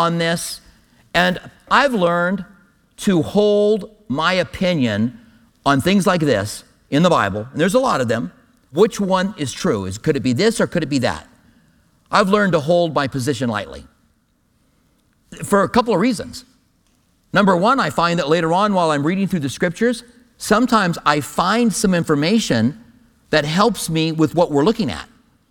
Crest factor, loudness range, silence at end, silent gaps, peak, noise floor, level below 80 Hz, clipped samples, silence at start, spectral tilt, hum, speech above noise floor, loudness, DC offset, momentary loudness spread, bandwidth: 18 dB; 3 LU; 0.45 s; none; 0 dBFS; -62 dBFS; -48 dBFS; under 0.1%; 0 s; -5 dB/octave; none; 44 dB; -18 LUFS; under 0.1%; 9 LU; 18.5 kHz